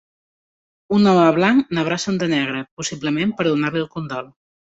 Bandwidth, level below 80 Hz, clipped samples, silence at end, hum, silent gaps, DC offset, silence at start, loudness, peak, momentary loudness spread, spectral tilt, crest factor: 8 kHz; -58 dBFS; under 0.1%; 0.5 s; none; 2.71-2.77 s; under 0.1%; 0.9 s; -19 LUFS; -4 dBFS; 13 LU; -5.5 dB/octave; 16 dB